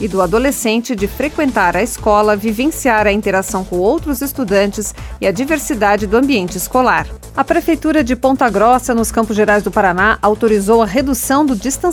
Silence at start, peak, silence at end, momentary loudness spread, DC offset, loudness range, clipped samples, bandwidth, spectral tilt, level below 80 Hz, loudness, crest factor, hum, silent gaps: 0 s; 0 dBFS; 0 s; 6 LU; under 0.1%; 3 LU; under 0.1%; 18 kHz; -4.5 dB/octave; -32 dBFS; -14 LUFS; 14 dB; none; none